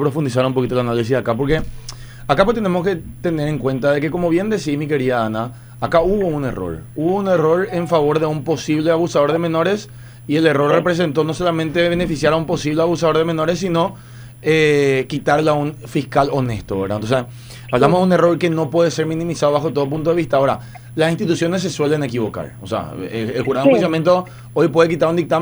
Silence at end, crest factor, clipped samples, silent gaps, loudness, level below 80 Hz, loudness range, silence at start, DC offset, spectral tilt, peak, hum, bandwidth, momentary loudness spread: 0 s; 16 dB; under 0.1%; none; -18 LUFS; -40 dBFS; 2 LU; 0 s; under 0.1%; -6.5 dB/octave; 0 dBFS; none; over 20 kHz; 10 LU